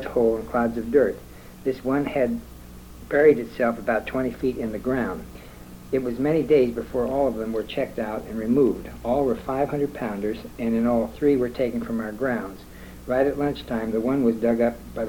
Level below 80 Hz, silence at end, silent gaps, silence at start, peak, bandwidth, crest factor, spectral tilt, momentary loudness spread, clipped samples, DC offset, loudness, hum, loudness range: -46 dBFS; 0 s; none; 0 s; -6 dBFS; 19 kHz; 18 dB; -7 dB/octave; 14 LU; under 0.1%; under 0.1%; -24 LUFS; none; 2 LU